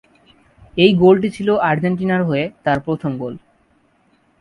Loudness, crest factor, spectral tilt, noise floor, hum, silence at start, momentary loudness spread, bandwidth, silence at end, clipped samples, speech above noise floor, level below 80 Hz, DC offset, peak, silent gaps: -17 LUFS; 18 dB; -7.5 dB/octave; -58 dBFS; none; 0.75 s; 15 LU; 11 kHz; 1.05 s; under 0.1%; 43 dB; -50 dBFS; under 0.1%; 0 dBFS; none